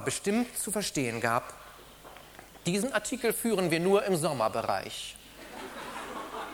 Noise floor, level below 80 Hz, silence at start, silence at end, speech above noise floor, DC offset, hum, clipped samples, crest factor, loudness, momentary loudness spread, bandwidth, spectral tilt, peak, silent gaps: -50 dBFS; -60 dBFS; 0 s; 0 s; 21 dB; under 0.1%; none; under 0.1%; 20 dB; -30 LUFS; 22 LU; over 20 kHz; -4 dB/octave; -10 dBFS; none